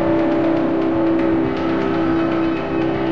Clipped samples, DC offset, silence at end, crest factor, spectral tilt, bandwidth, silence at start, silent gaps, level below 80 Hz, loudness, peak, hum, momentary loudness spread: under 0.1%; 2%; 0 s; 10 dB; -8.5 dB/octave; 6 kHz; 0 s; none; -42 dBFS; -18 LUFS; -6 dBFS; none; 3 LU